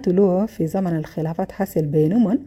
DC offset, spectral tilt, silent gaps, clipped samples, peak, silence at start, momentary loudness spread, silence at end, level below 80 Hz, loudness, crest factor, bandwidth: under 0.1%; -9 dB/octave; none; under 0.1%; -6 dBFS; 0 s; 8 LU; 0 s; -52 dBFS; -21 LUFS; 14 dB; 15.5 kHz